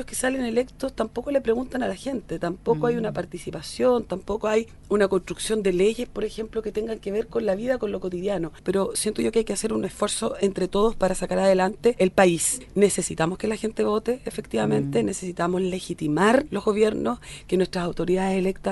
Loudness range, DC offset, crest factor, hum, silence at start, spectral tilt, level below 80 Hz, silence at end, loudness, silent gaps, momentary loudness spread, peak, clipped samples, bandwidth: 4 LU; under 0.1%; 20 dB; none; 0 s; -5 dB/octave; -46 dBFS; 0 s; -24 LUFS; none; 8 LU; -4 dBFS; under 0.1%; 11.5 kHz